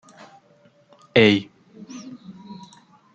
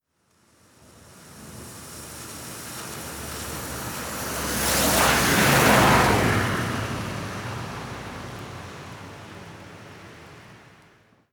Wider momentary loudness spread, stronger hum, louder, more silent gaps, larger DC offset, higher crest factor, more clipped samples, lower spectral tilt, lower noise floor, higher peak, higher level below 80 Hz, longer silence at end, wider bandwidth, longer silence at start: about the same, 26 LU vs 25 LU; neither; first, -18 LUFS vs -22 LUFS; neither; neither; about the same, 22 dB vs 22 dB; neither; first, -6 dB/octave vs -3.5 dB/octave; second, -57 dBFS vs -65 dBFS; about the same, -2 dBFS vs -4 dBFS; second, -62 dBFS vs -42 dBFS; second, 0.6 s vs 0.75 s; second, 8.4 kHz vs over 20 kHz; about the same, 1.15 s vs 1.1 s